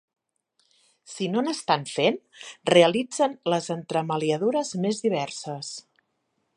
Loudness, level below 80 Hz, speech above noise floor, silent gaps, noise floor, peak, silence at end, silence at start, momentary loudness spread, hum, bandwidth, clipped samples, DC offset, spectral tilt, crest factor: -25 LUFS; -74 dBFS; 50 dB; none; -75 dBFS; -2 dBFS; 0.75 s; 1.1 s; 15 LU; none; 11 kHz; under 0.1%; under 0.1%; -4.5 dB/octave; 24 dB